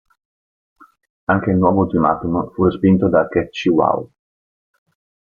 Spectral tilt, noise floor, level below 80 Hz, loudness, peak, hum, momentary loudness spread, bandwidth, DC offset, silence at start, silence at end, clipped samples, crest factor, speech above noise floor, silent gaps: -8.5 dB/octave; under -90 dBFS; -48 dBFS; -17 LUFS; -2 dBFS; none; 7 LU; 7 kHz; under 0.1%; 1.3 s; 1.3 s; under 0.1%; 16 dB; over 74 dB; none